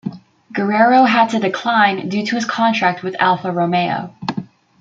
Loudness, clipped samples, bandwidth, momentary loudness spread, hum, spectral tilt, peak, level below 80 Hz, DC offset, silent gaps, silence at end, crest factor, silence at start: -16 LUFS; under 0.1%; 7.8 kHz; 14 LU; none; -5.5 dB/octave; -2 dBFS; -64 dBFS; under 0.1%; none; 0.35 s; 14 dB; 0.05 s